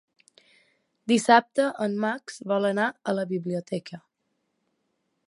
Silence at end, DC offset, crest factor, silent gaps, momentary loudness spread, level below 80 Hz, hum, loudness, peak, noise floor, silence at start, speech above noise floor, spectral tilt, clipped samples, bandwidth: 1.3 s; under 0.1%; 24 dB; none; 15 LU; -80 dBFS; none; -25 LUFS; -4 dBFS; -77 dBFS; 1.05 s; 52 dB; -5 dB/octave; under 0.1%; 11.5 kHz